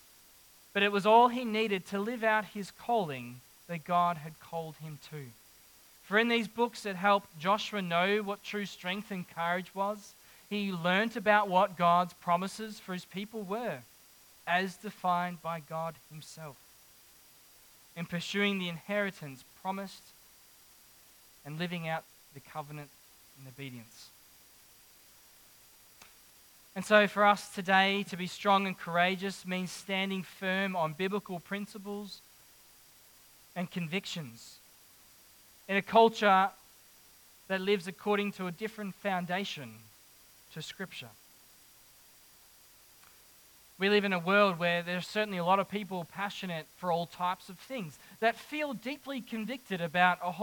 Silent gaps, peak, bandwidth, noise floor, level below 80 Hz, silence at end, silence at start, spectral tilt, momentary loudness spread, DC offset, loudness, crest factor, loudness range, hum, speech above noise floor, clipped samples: none; -8 dBFS; 19 kHz; -59 dBFS; -76 dBFS; 0 s; 0.75 s; -5 dB/octave; 20 LU; under 0.1%; -31 LUFS; 24 dB; 13 LU; none; 28 dB; under 0.1%